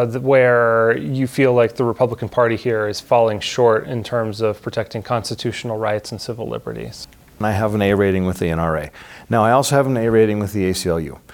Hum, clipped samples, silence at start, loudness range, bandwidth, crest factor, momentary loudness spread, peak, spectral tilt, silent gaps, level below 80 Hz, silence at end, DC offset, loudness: none; under 0.1%; 0 s; 7 LU; 18.5 kHz; 16 dB; 12 LU; -2 dBFS; -6 dB/octave; none; -46 dBFS; 0.15 s; under 0.1%; -18 LUFS